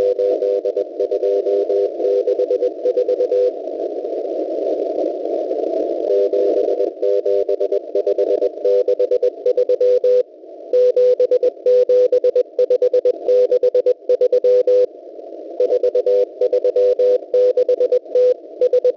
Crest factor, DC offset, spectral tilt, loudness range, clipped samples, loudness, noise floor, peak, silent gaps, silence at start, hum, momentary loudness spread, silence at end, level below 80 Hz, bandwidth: 10 dB; under 0.1%; -5.5 dB/octave; 4 LU; under 0.1%; -17 LUFS; -37 dBFS; -8 dBFS; none; 0 s; none; 7 LU; 0 s; -70 dBFS; 6 kHz